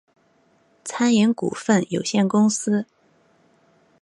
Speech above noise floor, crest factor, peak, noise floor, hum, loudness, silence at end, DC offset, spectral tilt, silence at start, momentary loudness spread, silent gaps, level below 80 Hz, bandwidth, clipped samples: 41 dB; 18 dB; -6 dBFS; -61 dBFS; none; -20 LUFS; 1.2 s; under 0.1%; -5 dB/octave; 0.85 s; 13 LU; none; -68 dBFS; 11.5 kHz; under 0.1%